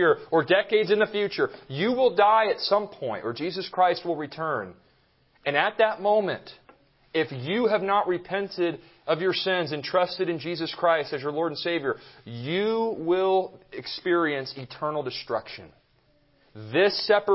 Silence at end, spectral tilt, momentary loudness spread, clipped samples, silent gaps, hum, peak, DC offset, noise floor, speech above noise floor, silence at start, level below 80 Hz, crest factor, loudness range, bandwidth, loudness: 0 s; -9 dB/octave; 11 LU; under 0.1%; none; none; -6 dBFS; under 0.1%; -64 dBFS; 39 dB; 0 s; -68 dBFS; 20 dB; 4 LU; 5.8 kHz; -25 LUFS